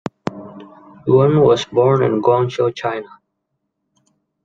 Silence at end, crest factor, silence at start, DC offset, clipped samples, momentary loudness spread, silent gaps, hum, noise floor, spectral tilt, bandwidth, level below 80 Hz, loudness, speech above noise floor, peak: 1.4 s; 16 dB; 0.25 s; under 0.1%; under 0.1%; 16 LU; none; none; -74 dBFS; -7.5 dB/octave; 7.6 kHz; -56 dBFS; -16 LUFS; 59 dB; -2 dBFS